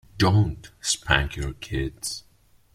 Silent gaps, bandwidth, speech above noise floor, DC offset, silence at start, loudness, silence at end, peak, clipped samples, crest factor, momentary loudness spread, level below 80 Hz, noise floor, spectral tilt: none; 14.5 kHz; 34 dB; under 0.1%; 0.15 s; -25 LUFS; 0.55 s; -2 dBFS; under 0.1%; 24 dB; 12 LU; -38 dBFS; -58 dBFS; -4 dB/octave